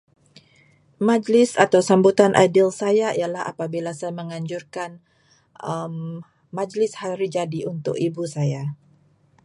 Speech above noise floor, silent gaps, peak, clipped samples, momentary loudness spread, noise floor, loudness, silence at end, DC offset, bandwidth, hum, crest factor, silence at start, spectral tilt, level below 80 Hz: 38 dB; none; 0 dBFS; under 0.1%; 17 LU; -58 dBFS; -21 LUFS; 0.7 s; under 0.1%; 11.5 kHz; none; 22 dB; 1 s; -6 dB/octave; -66 dBFS